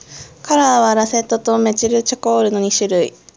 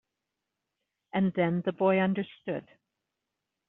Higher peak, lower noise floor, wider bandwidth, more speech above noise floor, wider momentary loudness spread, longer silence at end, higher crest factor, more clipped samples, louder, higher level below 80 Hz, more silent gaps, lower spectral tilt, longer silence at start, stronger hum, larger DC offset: first, 0 dBFS vs -14 dBFS; second, -35 dBFS vs -86 dBFS; first, 8 kHz vs 4 kHz; second, 20 dB vs 58 dB; second, 5 LU vs 11 LU; second, 0.3 s vs 1.05 s; about the same, 14 dB vs 18 dB; neither; first, -15 LUFS vs -29 LUFS; first, -54 dBFS vs -72 dBFS; neither; second, -3 dB/octave vs -6 dB/octave; second, 0.1 s vs 1.15 s; neither; neither